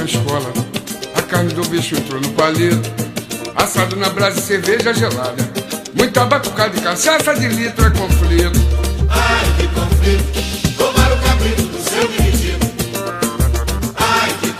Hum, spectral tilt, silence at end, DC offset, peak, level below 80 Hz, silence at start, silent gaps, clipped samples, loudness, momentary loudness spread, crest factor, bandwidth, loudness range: none; -4.5 dB/octave; 0 s; under 0.1%; 0 dBFS; -20 dBFS; 0 s; none; under 0.1%; -16 LUFS; 8 LU; 16 dB; 16 kHz; 3 LU